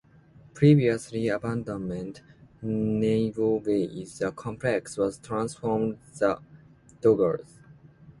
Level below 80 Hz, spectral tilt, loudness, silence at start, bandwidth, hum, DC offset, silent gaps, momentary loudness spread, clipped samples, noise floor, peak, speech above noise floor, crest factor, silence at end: -58 dBFS; -7.5 dB/octave; -27 LUFS; 0.55 s; 11.5 kHz; none; under 0.1%; none; 11 LU; under 0.1%; -54 dBFS; -6 dBFS; 29 dB; 20 dB; 0.1 s